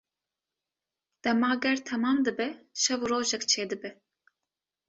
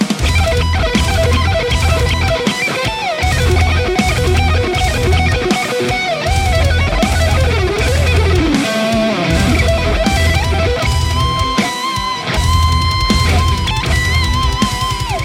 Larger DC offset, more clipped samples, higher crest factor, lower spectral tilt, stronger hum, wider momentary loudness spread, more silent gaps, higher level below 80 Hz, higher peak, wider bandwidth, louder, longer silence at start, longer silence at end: neither; neither; first, 20 dB vs 12 dB; second, -2 dB/octave vs -5 dB/octave; neither; first, 8 LU vs 3 LU; neither; second, -72 dBFS vs -20 dBFS; second, -12 dBFS vs 0 dBFS; second, 8.2 kHz vs 16 kHz; second, -28 LUFS vs -14 LUFS; first, 1.25 s vs 0 s; first, 0.95 s vs 0 s